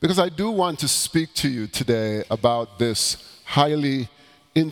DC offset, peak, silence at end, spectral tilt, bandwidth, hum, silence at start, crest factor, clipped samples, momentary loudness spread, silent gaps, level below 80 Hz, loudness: under 0.1%; -2 dBFS; 0 s; -4 dB/octave; 20 kHz; none; 0 s; 20 dB; under 0.1%; 5 LU; none; -52 dBFS; -22 LUFS